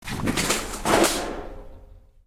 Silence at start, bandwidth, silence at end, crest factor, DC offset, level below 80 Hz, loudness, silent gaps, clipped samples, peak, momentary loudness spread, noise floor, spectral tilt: 0.05 s; 16.5 kHz; 0.3 s; 20 dB; under 0.1%; -40 dBFS; -23 LUFS; none; under 0.1%; -6 dBFS; 16 LU; -48 dBFS; -3 dB/octave